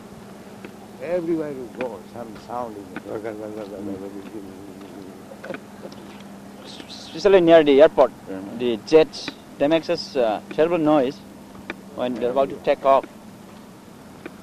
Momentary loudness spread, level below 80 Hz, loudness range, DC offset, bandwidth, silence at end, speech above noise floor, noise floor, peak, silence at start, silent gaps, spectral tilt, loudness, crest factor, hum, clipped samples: 24 LU; -56 dBFS; 17 LU; under 0.1%; 14.5 kHz; 0 s; 23 dB; -43 dBFS; -2 dBFS; 0 s; none; -6 dB/octave; -20 LUFS; 22 dB; none; under 0.1%